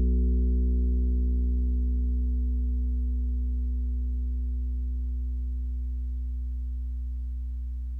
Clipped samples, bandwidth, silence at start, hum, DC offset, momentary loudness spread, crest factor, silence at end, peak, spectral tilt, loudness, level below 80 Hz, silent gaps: under 0.1%; 0.5 kHz; 0 s; none; under 0.1%; 8 LU; 10 dB; 0 s; -16 dBFS; -12.5 dB/octave; -30 LUFS; -26 dBFS; none